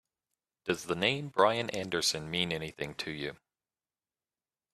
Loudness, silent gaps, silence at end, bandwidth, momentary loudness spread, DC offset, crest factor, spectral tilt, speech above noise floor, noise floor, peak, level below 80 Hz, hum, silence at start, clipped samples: -32 LUFS; none; 1.4 s; 15 kHz; 11 LU; under 0.1%; 24 dB; -3.5 dB/octave; over 58 dB; under -90 dBFS; -10 dBFS; -66 dBFS; none; 0.65 s; under 0.1%